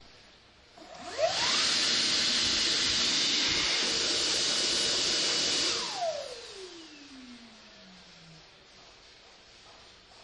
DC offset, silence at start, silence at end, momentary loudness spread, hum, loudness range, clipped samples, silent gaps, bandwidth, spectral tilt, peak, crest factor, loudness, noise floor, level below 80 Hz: under 0.1%; 0 s; 0 s; 20 LU; none; 13 LU; under 0.1%; none; 11.5 kHz; 0 dB/octave; -16 dBFS; 16 dB; -26 LUFS; -57 dBFS; -60 dBFS